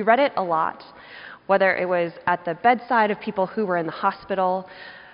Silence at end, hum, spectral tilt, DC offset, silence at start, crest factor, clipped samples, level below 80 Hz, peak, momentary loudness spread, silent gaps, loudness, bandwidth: 0.15 s; none; -3.5 dB/octave; under 0.1%; 0 s; 20 dB; under 0.1%; -64 dBFS; -4 dBFS; 21 LU; none; -22 LUFS; 5.4 kHz